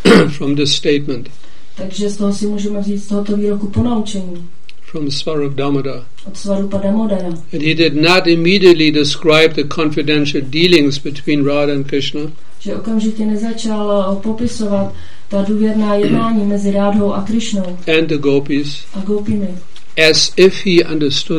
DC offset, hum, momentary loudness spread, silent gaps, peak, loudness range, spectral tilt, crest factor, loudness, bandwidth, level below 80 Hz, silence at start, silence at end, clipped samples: 10%; none; 14 LU; none; 0 dBFS; 7 LU; -5 dB/octave; 16 dB; -14 LUFS; 12 kHz; -46 dBFS; 0.05 s; 0 s; 0.3%